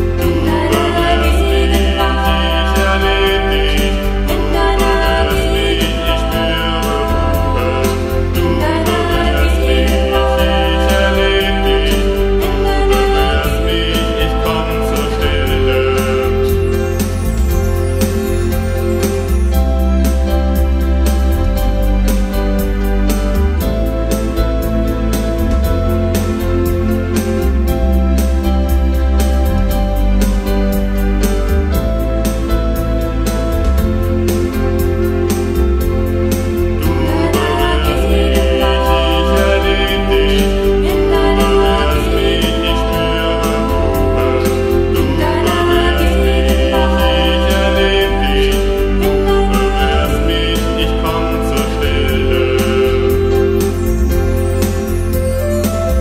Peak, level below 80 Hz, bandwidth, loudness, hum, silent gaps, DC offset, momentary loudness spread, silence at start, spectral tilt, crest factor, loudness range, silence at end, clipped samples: 0 dBFS; -16 dBFS; 16 kHz; -14 LUFS; none; none; under 0.1%; 4 LU; 0 s; -5.5 dB/octave; 12 dB; 3 LU; 0 s; under 0.1%